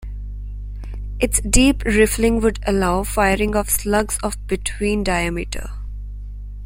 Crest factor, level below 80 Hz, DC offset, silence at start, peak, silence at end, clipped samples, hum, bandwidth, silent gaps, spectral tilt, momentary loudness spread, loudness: 20 dB; -28 dBFS; under 0.1%; 0 s; 0 dBFS; 0 s; under 0.1%; 50 Hz at -30 dBFS; 16.5 kHz; none; -4 dB/octave; 17 LU; -19 LUFS